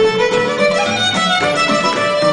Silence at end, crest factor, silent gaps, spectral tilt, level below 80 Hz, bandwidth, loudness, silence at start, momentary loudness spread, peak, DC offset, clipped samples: 0 s; 12 dB; none; -3.5 dB/octave; -50 dBFS; 10.5 kHz; -14 LUFS; 0 s; 1 LU; -2 dBFS; under 0.1%; under 0.1%